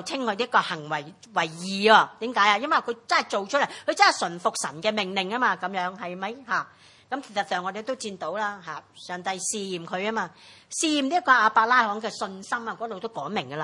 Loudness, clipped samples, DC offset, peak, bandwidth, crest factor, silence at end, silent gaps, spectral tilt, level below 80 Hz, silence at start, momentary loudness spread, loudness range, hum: -25 LUFS; under 0.1%; under 0.1%; -2 dBFS; 12 kHz; 24 dB; 0 s; none; -2.5 dB/octave; -78 dBFS; 0 s; 14 LU; 9 LU; none